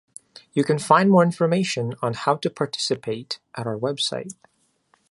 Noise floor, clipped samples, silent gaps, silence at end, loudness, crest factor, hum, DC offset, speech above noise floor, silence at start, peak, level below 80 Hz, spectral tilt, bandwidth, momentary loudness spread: -65 dBFS; under 0.1%; none; 0.8 s; -22 LUFS; 22 dB; none; under 0.1%; 43 dB; 0.55 s; -2 dBFS; -66 dBFS; -5.5 dB/octave; 11.5 kHz; 13 LU